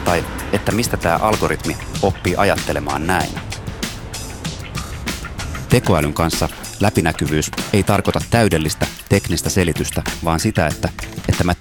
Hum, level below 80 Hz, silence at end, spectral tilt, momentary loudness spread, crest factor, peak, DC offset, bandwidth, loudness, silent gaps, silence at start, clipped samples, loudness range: none; -32 dBFS; 0.05 s; -5 dB/octave; 10 LU; 18 dB; 0 dBFS; under 0.1%; 20 kHz; -19 LUFS; none; 0 s; under 0.1%; 4 LU